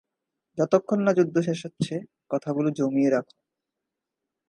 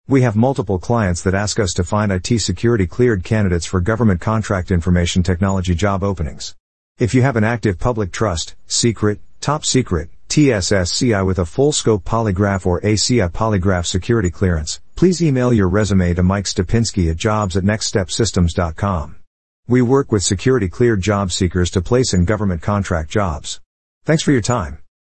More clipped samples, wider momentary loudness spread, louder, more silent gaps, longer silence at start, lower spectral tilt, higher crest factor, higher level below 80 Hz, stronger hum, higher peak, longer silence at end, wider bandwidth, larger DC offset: neither; first, 9 LU vs 6 LU; second, -25 LUFS vs -17 LUFS; second, none vs 6.60-6.96 s, 19.27-19.63 s, 23.66-24.01 s; first, 0.55 s vs 0.05 s; first, -7 dB/octave vs -5.5 dB/octave; first, 20 dB vs 14 dB; second, -74 dBFS vs -36 dBFS; neither; second, -6 dBFS vs -2 dBFS; first, 1.25 s vs 0.35 s; first, 11.5 kHz vs 8.8 kHz; second, under 0.1% vs 1%